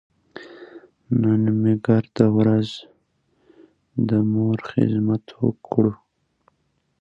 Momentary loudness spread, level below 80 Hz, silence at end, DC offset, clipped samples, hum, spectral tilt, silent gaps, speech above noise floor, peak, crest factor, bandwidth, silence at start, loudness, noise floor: 20 LU; -58 dBFS; 1.05 s; under 0.1%; under 0.1%; none; -9.5 dB/octave; none; 50 dB; -2 dBFS; 20 dB; 7.4 kHz; 0.35 s; -21 LUFS; -69 dBFS